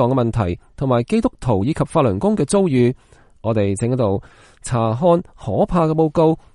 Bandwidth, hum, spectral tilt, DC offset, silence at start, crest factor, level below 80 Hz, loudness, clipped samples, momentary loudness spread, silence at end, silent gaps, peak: 11.5 kHz; none; -7.5 dB/octave; under 0.1%; 0 s; 14 dB; -40 dBFS; -18 LUFS; under 0.1%; 8 LU; 0.2 s; none; -4 dBFS